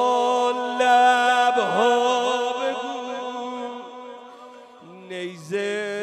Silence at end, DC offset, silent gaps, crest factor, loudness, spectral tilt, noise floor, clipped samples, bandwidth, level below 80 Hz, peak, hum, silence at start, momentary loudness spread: 0 s; under 0.1%; none; 16 dB; -21 LUFS; -3 dB/octave; -44 dBFS; under 0.1%; 12.5 kHz; -78 dBFS; -6 dBFS; none; 0 s; 20 LU